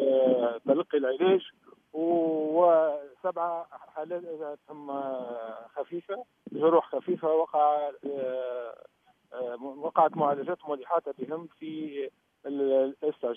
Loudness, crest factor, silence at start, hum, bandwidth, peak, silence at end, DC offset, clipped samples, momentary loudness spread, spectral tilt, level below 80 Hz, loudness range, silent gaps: -29 LUFS; 20 dB; 0 s; none; 3.7 kHz; -8 dBFS; 0 s; under 0.1%; under 0.1%; 15 LU; -9 dB/octave; -84 dBFS; 5 LU; none